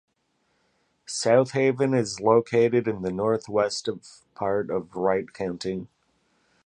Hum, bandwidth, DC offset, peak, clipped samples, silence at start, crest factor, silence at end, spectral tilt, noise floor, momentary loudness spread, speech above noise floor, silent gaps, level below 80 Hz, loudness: none; 10.5 kHz; under 0.1%; -6 dBFS; under 0.1%; 1.1 s; 20 dB; 0.8 s; -5.5 dB/octave; -71 dBFS; 12 LU; 47 dB; none; -62 dBFS; -25 LUFS